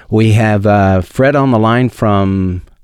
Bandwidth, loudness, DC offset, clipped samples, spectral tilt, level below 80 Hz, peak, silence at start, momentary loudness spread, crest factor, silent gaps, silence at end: 12 kHz; -11 LUFS; under 0.1%; under 0.1%; -8 dB/octave; -38 dBFS; -2 dBFS; 0.1 s; 4 LU; 10 dB; none; 0.2 s